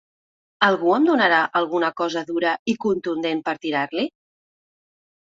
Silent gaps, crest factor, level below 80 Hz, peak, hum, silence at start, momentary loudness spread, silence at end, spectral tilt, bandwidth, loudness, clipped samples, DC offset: 2.59-2.65 s; 20 dB; -68 dBFS; -2 dBFS; none; 0.6 s; 8 LU; 1.2 s; -5 dB/octave; 7.6 kHz; -21 LUFS; under 0.1%; under 0.1%